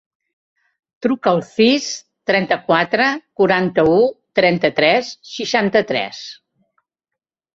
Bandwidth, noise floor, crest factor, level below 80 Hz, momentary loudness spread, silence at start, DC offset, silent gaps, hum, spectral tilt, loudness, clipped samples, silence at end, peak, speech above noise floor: 7.8 kHz; -84 dBFS; 18 dB; -56 dBFS; 11 LU; 1 s; under 0.1%; none; none; -4.5 dB/octave; -17 LUFS; under 0.1%; 1.2 s; -2 dBFS; 68 dB